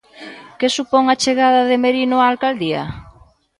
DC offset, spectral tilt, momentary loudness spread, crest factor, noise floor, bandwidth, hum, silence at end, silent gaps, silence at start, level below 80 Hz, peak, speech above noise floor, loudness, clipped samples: under 0.1%; -4 dB/octave; 22 LU; 16 dB; -48 dBFS; 11.5 kHz; none; 0.5 s; none; 0.2 s; -50 dBFS; -2 dBFS; 32 dB; -16 LUFS; under 0.1%